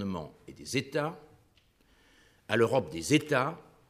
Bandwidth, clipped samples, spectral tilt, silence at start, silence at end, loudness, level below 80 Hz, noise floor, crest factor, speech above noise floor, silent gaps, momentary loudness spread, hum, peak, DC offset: 15.5 kHz; under 0.1%; -5 dB/octave; 0 s; 0.3 s; -30 LUFS; -64 dBFS; -66 dBFS; 22 dB; 36 dB; none; 17 LU; none; -10 dBFS; under 0.1%